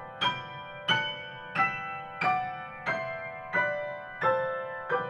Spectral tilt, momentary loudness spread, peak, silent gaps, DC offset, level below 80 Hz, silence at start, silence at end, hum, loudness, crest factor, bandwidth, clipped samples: -4.5 dB/octave; 10 LU; -12 dBFS; none; under 0.1%; -68 dBFS; 0 s; 0 s; none; -31 LUFS; 20 dB; 11 kHz; under 0.1%